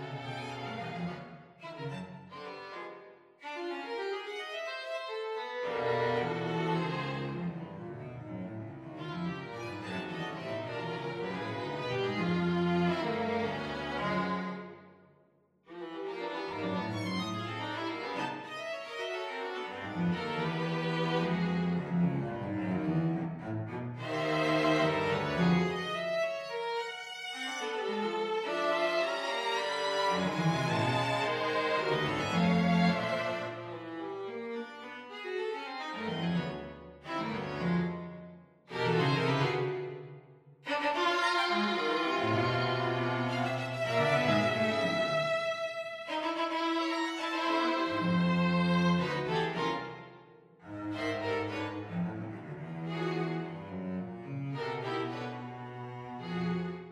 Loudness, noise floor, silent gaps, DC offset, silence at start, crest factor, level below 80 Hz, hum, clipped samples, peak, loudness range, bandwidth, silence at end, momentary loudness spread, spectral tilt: -33 LUFS; -68 dBFS; none; under 0.1%; 0 s; 20 dB; -66 dBFS; none; under 0.1%; -14 dBFS; 8 LU; 11 kHz; 0 s; 14 LU; -6 dB/octave